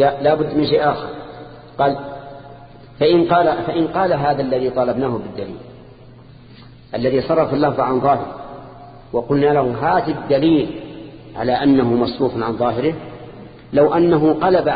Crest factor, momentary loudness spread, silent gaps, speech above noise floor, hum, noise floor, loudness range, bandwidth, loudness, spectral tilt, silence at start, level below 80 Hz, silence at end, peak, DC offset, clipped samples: 16 dB; 20 LU; none; 25 dB; none; -41 dBFS; 4 LU; 5 kHz; -17 LUFS; -12 dB/octave; 0 s; -48 dBFS; 0 s; -2 dBFS; under 0.1%; under 0.1%